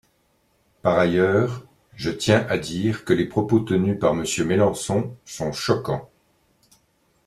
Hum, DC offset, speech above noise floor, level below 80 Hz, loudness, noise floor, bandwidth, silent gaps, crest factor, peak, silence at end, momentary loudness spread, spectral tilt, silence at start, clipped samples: none; under 0.1%; 44 dB; -54 dBFS; -22 LUFS; -65 dBFS; 14 kHz; none; 20 dB; -4 dBFS; 1.2 s; 10 LU; -5.5 dB/octave; 0.85 s; under 0.1%